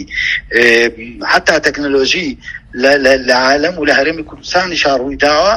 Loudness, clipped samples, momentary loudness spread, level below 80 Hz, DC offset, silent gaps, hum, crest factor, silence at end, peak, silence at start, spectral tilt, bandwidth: -12 LUFS; 0.3%; 8 LU; -38 dBFS; under 0.1%; none; none; 12 dB; 0 s; 0 dBFS; 0 s; -3 dB/octave; 16 kHz